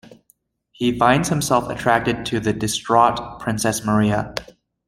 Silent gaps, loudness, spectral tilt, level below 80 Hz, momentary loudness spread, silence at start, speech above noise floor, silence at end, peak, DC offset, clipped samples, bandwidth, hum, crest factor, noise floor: none; -19 LUFS; -4.5 dB/octave; -46 dBFS; 8 LU; 0.1 s; 43 dB; 0.45 s; -2 dBFS; under 0.1%; under 0.1%; 16 kHz; none; 18 dB; -62 dBFS